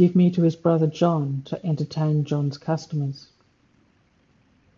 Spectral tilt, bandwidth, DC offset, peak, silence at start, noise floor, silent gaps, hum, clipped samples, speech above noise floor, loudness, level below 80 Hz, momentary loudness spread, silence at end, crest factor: -8.5 dB/octave; 7.2 kHz; under 0.1%; -6 dBFS; 0 s; -62 dBFS; none; none; under 0.1%; 40 dB; -23 LUFS; -66 dBFS; 10 LU; 1.6 s; 18 dB